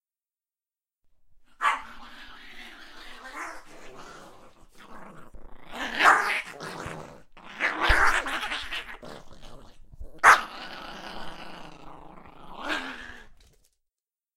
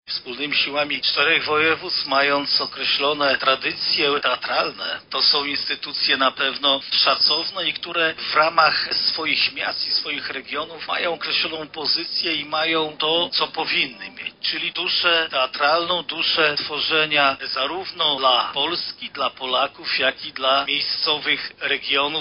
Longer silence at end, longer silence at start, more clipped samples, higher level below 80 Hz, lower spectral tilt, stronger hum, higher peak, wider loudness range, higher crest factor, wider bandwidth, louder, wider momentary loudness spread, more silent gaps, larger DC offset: first, 1.05 s vs 0 s; first, 1.3 s vs 0.05 s; neither; first, -44 dBFS vs -64 dBFS; first, -2 dB/octave vs 1.5 dB/octave; neither; about the same, -2 dBFS vs -2 dBFS; first, 16 LU vs 3 LU; first, 28 dB vs 20 dB; first, 16 kHz vs 5.6 kHz; second, -24 LUFS vs -20 LUFS; first, 27 LU vs 8 LU; neither; neither